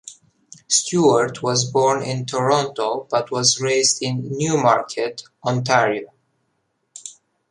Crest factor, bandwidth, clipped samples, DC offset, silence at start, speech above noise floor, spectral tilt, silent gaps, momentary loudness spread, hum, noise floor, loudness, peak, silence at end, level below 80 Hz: 18 dB; 11.5 kHz; under 0.1%; under 0.1%; 0.05 s; 51 dB; -3.5 dB/octave; none; 11 LU; none; -71 dBFS; -19 LUFS; -2 dBFS; 0.4 s; -62 dBFS